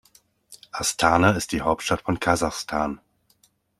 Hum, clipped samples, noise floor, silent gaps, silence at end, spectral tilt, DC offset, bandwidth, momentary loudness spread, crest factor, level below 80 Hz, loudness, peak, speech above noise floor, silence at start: none; under 0.1%; -64 dBFS; none; 0.85 s; -4 dB/octave; under 0.1%; 15 kHz; 10 LU; 22 dB; -48 dBFS; -23 LUFS; -2 dBFS; 41 dB; 0.5 s